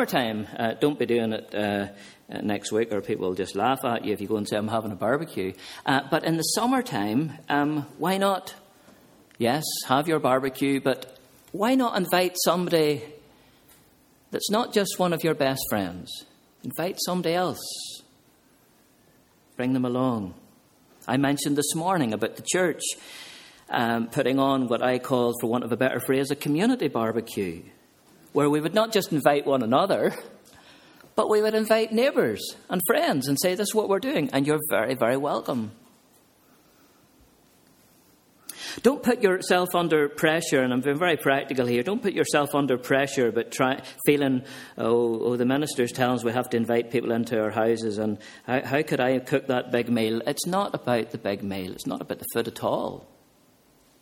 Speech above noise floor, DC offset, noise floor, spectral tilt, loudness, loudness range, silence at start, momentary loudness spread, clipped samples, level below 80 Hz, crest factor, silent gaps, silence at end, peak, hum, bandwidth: 35 dB; under 0.1%; -60 dBFS; -4.5 dB/octave; -25 LUFS; 6 LU; 0 s; 10 LU; under 0.1%; -66 dBFS; 22 dB; none; 1 s; -2 dBFS; none; 17 kHz